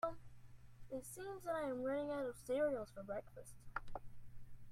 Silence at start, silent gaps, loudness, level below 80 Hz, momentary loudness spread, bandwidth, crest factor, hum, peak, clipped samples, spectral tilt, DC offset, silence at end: 0 s; none; -44 LUFS; -62 dBFS; 24 LU; 16 kHz; 18 dB; none; -26 dBFS; under 0.1%; -5.5 dB/octave; under 0.1%; 0 s